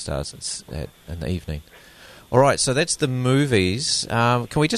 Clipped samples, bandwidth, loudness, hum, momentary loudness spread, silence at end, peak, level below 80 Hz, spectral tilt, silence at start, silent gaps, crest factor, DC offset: under 0.1%; 13.5 kHz; -21 LUFS; none; 16 LU; 0 s; -4 dBFS; -42 dBFS; -4.5 dB/octave; 0 s; none; 18 dB; under 0.1%